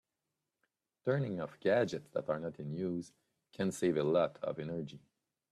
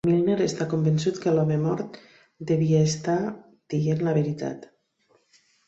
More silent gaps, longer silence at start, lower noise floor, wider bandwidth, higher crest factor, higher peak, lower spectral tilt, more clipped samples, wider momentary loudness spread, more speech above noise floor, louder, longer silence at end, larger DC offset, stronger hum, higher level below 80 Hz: neither; first, 1.05 s vs 0.05 s; first, -88 dBFS vs -66 dBFS; first, 13.5 kHz vs 8 kHz; about the same, 18 dB vs 16 dB; second, -18 dBFS vs -10 dBFS; about the same, -6.5 dB/octave vs -7 dB/octave; neither; about the same, 10 LU vs 12 LU; first, 53 dB vs 42 dB; second, -36 LUFS vs -25 LUFS; second, 0.55 s vs 1 s; neither; neither; second, -74 dBFS vs -62 dBFS